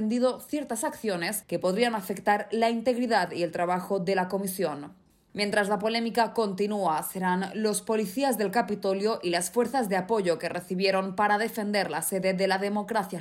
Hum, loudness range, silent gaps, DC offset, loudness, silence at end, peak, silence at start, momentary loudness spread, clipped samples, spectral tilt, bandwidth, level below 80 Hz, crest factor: none; 1 LU; none; under 0.1%; -27 LUFS; 0 s; -12 dBFS; 0 s; 5 LU; under 0.1%; -4.5 dB/octave; 16 kHz; -70 dBFS; 16 dB